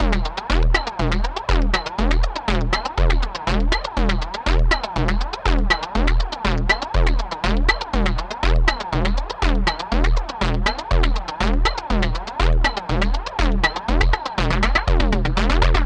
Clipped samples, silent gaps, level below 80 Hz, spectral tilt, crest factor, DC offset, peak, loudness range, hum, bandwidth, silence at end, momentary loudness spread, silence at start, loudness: under 0.1%; none; -20 dBFS; -5.5 dB/octave; 16 dB; under 0.1%; -2 dBFS; 1 LU; none; 8.6 kHz; 0 s; 4 LU; 0 s; -21 LUFS